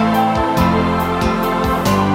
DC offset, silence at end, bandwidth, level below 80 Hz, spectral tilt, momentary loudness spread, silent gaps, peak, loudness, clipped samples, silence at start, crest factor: under 0.1%; 0 s; 16.5 kHz; -30 dBFS; -6 dB/octave; 2 LU; none; -2 dBFS; -16 LUFS; under 0.1%; 0 s; 14 dB